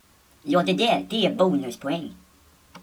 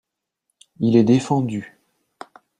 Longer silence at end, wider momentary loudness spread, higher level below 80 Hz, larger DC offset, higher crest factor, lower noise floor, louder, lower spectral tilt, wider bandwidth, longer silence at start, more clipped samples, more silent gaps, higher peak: second, 0.05 s vs 0.95 s; about the same, 11 LU vs 12 LU; about the same, -62 dBFS vs -60 dBFS; neither; about the same, 18 dB vs 18 dB; second, -56 dBFS vs -77 dBFS; second, -23 LUFS vs -19 LUFS; second, -5.5 dB/octave vs -7.5 dB/octave; first, 19 kHz vs 10.5 kHz; second, 0.45 s vs 0.8 s; neither; neither; second, -8 dBFS vs -2 dBFS